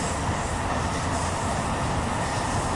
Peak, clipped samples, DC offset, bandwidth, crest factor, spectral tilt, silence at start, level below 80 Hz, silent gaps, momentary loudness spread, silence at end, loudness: -14 dBFS; under 0.1%; under 0.1%; 11.5 kHz; 14 dB; -4.5 dB/octave; 0 s; -38 dBFS; none; 1 LU; 0 s; -27 LUFS